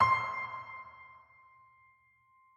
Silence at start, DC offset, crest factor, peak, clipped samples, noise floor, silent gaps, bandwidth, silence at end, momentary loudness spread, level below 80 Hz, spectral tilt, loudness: 0 s; under 0.1%; 22 dB; -14 dBFS; under 0.1%; -67 dBFS; none; 8.2 kHz; 1.4 s; 25 LU; -72 dBFS; -4.5 dB/octave; -34 LUFS